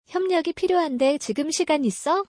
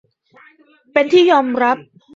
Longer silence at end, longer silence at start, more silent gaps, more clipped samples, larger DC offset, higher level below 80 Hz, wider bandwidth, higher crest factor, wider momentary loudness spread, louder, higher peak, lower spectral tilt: second, 0.05 s vs 0.35 s; second, 0.1 s vs 0.95 s; neither; neither; neither; about the same, -64 dBFS vs -66 dBFS; first, 10.5 kHz vs 7.6 kHz; about the same, 12 dB vs 16 dB; second, 3 LU vs 8 LU; second, -23 LUFS vs -15 LUFS; second, -10 dBFS vs 0 dBFS; about the same, -3.5 dB/octave vs -4.5 dB/octave